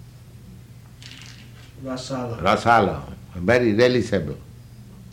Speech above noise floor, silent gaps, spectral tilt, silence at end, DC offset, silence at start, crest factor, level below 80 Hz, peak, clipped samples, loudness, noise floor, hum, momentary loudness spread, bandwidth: 23 dB; none; -6 dB/octave; 0.05 s; under 0.1%; 0.05 s; 18 dB; -48 dBFS; -4 dBFS; under 0.1%; -21 LUFS; -43 dBFS; none; 24 LU; 16 kHz